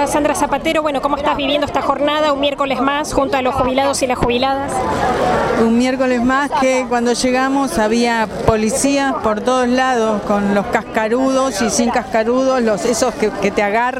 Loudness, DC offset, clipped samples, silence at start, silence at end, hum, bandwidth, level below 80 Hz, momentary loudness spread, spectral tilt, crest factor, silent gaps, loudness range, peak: -16 LUFS; under 0.1%; under 0.1%; 0 s; 0 s; none; 16 kHz; -38 dBFS; 3 LU; -4 dB/octave; 16 dB; none; 1 LU; 0 dBFS